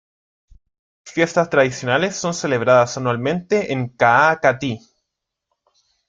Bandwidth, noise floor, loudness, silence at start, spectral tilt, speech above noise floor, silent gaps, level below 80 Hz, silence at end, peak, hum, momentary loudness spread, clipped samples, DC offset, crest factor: 9.2 kHz; -80 dBFS; -18 LUFS; 1.05 s; -5 dB/octave; 63 dB; none; -58 dBFS; 1.3 s; -2 dBFS; none; 11 LU; under 0.1%; under 0.1%; 18 dB